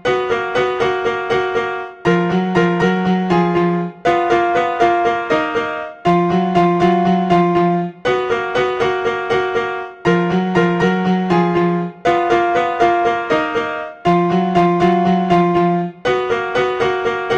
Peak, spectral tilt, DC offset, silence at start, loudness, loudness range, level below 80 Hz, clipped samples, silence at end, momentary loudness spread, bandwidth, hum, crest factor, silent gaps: -2 dBFS; -7 dB/octave; under 0.1%; 0.05 s; -16 LUFS; 2 LU; -48 dBFS; under 0.1%; 0 s; 5 LU; 8.2 kHz; none; 14 dB; none